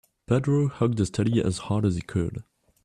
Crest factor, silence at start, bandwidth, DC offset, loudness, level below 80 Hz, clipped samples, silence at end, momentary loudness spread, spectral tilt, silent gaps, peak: 16 dB; 0.3 s; 11 kHz; under 0.1%; -26 LUFS; -50 dBFS; under 0.1%; 0.45 s; 6 LU; -7 dB/octave; none; -10 dBFS